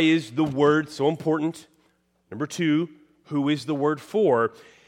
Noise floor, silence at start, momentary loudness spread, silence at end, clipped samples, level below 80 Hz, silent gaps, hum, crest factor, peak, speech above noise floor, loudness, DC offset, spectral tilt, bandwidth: -66 dBFS; 0 s; 11 LU; 0.4 s; under 0.1%; -68 dBFS; none; none; 16 dB; -8 dBFS; 43 dB; -24 LUFS; under 0.1%; -6 dB/octave; 12 kHz